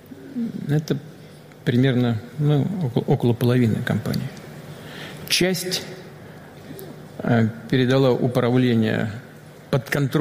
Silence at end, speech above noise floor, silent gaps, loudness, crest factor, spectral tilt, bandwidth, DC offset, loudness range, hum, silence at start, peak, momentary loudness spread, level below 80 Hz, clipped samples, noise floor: 0 s; 23 dB; none; -21 LUFS; 16 dB; -6 dB/octave; 16 kHz; under 0.1%; 4 LU; none; 0.1 s; -6 dBFS; 19 LU; -56 dBFS; under 0.1%; -43 dBFS